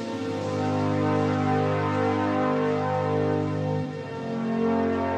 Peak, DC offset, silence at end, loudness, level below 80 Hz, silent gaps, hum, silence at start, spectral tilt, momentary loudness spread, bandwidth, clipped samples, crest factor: -12 dBFS; under 0.1%; 0 s; -26 LUFS; -66 dBFS; none; none; 0 s; -7.5 dB/octave; 6 LU; 9.2 kHz; under 0.1%; 12 dB